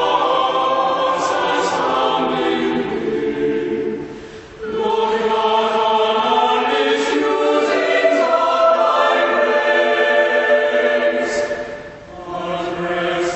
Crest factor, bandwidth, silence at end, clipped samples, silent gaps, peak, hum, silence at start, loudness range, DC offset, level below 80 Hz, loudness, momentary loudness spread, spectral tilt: 14 dB; 8.4 kHz; 0 s; under 0.1%; none; -4 dBFS; none; 0 s; 5 LU; under 0.1%; -52 dBFS; -17 LUFS; 11 LU; -4 dB/octave